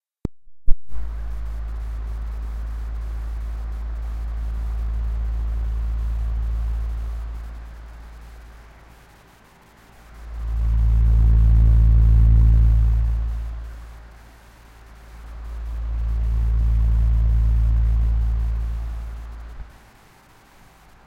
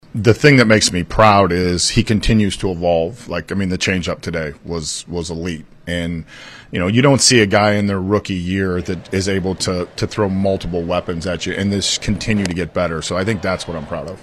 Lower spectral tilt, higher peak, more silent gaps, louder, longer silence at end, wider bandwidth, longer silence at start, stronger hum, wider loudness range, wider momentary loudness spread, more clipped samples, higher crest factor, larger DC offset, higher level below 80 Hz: first, -8.5 dB/octave vs -4.5 dB/octave; about the same, 0 dBFS vs 0 dBFS; neither; second, -23 LUFS vs -17 LUFS; first, 1.4 s vs 0 s; second, 2.9 kHz vs 13.5 kHz; about the same, 0.25 s vs 0.15 s; neither; first, 14 LU vs 7 LU; first, 23 LU vs 14 LU; neither; about the same, 20 dB vs 16 dB; neither; first, -22 dBFS vs -34 dBFS